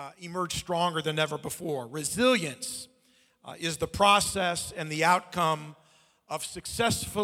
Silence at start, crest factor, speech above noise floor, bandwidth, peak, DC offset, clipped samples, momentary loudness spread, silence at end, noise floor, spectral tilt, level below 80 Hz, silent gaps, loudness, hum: 0 s; 20 dB; 37 dB; 17 kHz; -8 dBFS; under 0.1%; under 0.1%; 13 LU; 0 s; -65 dBFS; -3 dB/octave; -56 dBFS; none; -28 LUFS; none